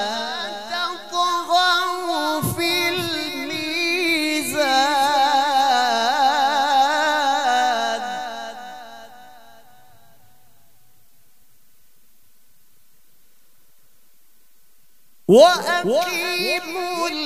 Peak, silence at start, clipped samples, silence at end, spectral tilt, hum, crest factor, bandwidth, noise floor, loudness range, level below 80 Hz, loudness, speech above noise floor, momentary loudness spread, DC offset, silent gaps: 0 dBFS; 0 s; under 0.1%; 0 s; -3 dB/octave; none; 20 dB; 16 kHz; -60 dBFS; 9 LU; -62 dBFS; -19 LUFS; 43 dB; 10 LU; 0.5%; none